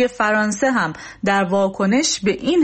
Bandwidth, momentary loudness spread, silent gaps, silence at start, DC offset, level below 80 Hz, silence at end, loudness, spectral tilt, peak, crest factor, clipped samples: 8.8 kHz; 4 LU; none; 0 s; under 0.1%; -52 dBFS; 0 s; -18 LUFS; -4 dB/octave; -6 dBFS; 12 dB; under 0.1%